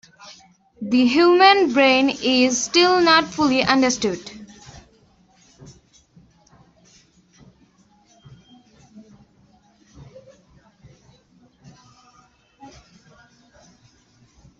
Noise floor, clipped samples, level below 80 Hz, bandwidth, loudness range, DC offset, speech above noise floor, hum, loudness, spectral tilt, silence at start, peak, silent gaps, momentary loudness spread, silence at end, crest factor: -57 dBFS; under 0.1%; -58 dBFS; 8 kHz; 11 LU; under 0.1%; 40 dB; none; -16 LUFS; -2.5 dB/octave; 0.25 s; -2 dBFS; none; 14 LU; 1.9 s; 20 dB